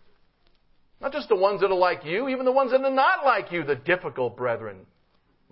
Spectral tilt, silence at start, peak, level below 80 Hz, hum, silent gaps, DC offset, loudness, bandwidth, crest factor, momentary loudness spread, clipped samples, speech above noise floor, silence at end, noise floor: -9.5 dB/octave; 1 s; -6 dBFS; -64 dBFS; none; none; under 0.1%; -24 LUFS; 5.8 kHz; 18 dB; 11 LU; under 0.1%; 41 dB; 0.7 s; -65 dBFS